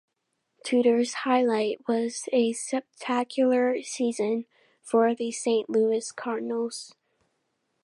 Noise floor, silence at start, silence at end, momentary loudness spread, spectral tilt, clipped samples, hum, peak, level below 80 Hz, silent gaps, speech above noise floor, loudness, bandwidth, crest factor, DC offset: -78 dBFS; 0.65 s; 0.95 s; 9 LU; -3.5 dB/octave; under 0.1%; none; -10 dBFS; -84 dBFS; none; 53 dB; -26 LUFS; 11.5 kHz; 16 dB; under 0.1%